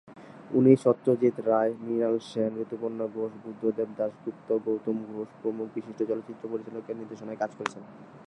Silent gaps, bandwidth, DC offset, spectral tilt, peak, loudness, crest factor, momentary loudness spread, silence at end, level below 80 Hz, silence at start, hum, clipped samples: none; 10.5 kHz; under 0.1%; -8 dB/octave; -6 dBFS; -29 LUFS; 22 dB; 14 LU; 0.05 s; -78 dBFS; 0.05 s; none; under 0.1%